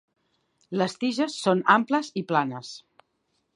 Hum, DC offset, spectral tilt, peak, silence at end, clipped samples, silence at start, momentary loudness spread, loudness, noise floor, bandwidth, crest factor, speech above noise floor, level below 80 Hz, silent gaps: none; under 0.1%; -5 dB/octave; -4 dBFS; 0.75 s; under 0.1%; 0.7 s; 16 LU; -25 LUFS; -74 dBFS; 11 kHz; 24 dB; 50 dB; -78 dBFS; none